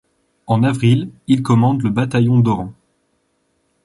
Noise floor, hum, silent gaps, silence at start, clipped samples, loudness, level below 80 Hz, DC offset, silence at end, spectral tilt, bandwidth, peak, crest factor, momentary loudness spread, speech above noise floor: -65 dBFS; none; none; 0.5 s; under 0.1%; -16 LUFS; -50 dBFS; under 0.1%; 1.15 s; -8 dB/octave; 11.5 kHz; -2 dBFS; 14 dB; 6 LU; 50 dB